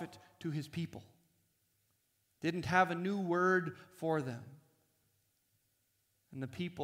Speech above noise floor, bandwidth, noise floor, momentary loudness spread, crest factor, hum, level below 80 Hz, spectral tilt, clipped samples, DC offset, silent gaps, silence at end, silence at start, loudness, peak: 43 dB; 16 kHz; -79 dBFS; 16 LU; 24 dB; none; -72 dBFS; -6.5 dB/octave; under 0.1%; under 0.1%; none; 0 s; 0 s; -36 LUFS; -16 dBFS